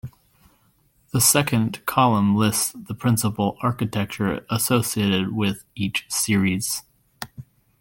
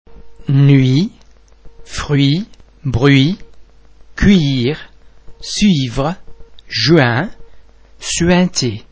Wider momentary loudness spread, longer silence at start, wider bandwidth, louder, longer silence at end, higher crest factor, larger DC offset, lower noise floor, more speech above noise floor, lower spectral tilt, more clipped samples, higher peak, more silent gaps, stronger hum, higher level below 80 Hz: second, 10 LU vs 17 LU; about the same, 0.05 s vs 0.1 s; first, 17 kHz vs 8 kHz; second, -21 LUFS vs -14 LUFS; first, 0.4 s vs 0.15 s; about the same, 20 dB vs 16 dB; neither; first, -62 dBFS vs -44 dBFS; first, 40 dB vs 32 dB; second, -4 dB/octave vs -5.5 dB/octave; neither; second, -4 dBFS vs 0 dBFS; neither; neither; second, -54 dBFS vs -34 dBFS